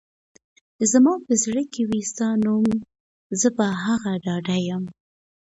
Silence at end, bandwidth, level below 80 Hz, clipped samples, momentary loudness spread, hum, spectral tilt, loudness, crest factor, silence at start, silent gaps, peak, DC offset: 0.65 s; 8.2 kHz; -60 dBFS; under 0.1%; 10 LU; none; -4.5 dB/octave; -22 LUFS; 18 dB; 0.8 s; 3.00-3.30 s; -6 dBFS; under 0.1%